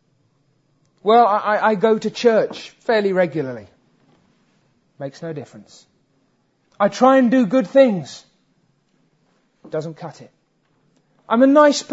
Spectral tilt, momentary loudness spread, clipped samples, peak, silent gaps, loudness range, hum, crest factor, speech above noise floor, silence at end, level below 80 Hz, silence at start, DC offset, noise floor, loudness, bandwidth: -5.5 dB/octave; 20 LU; under 0.1%; 0 dBFS; none; 16 LU; none; 18 dB; 47 dB; 0 s; -70 dBFS; 1.05 s; under 0.1%; -64 dBFS; -17 LUFS; 8 kHz